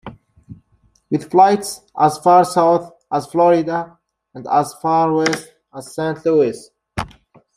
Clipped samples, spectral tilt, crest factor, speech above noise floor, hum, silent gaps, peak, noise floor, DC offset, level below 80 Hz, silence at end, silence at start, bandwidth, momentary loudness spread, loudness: under 0.1%; -5.5 dB/octave; 18 dB; 43 dB; none; none; 0 dBFS; -59 dBFS; under 0.1%; -50 dBFS; 0.5 s; 0.05 s; 15 kHz; 18 LU; -17 LUFS